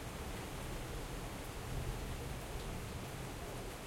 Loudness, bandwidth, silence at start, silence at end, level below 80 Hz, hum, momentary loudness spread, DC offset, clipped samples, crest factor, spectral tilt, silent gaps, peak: -45 LUFS; 16.5 kHz; 0 s; 0 s; -48 dBFS; none; 2 LU; under 0.1%; under 0.1%; 16 dB; -4.5 dB/octave; none; -28 dBFS